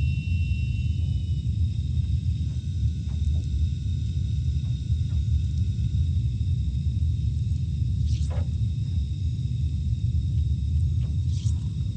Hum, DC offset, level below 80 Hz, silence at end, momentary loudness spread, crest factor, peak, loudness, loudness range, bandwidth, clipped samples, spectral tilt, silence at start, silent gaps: none; under 0.1%; -30 dBFS; 0 s; 2 LU; 12 dB; -14 dBFS; -27 LUFS; 1 LU; 8.6 kHz; under 0.1%; -7.5 dB/octave; 0 s; none